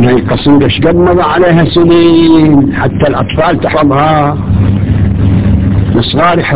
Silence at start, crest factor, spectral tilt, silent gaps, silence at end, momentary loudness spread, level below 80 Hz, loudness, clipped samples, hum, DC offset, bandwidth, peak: 0 s; 8 dB; -11.5 dB/octave; none; 0 s; 5 LU; -20 dBFS; -8 LUFS; 0.8%; none; under 0.1%; 4 kHz; 0 dBFS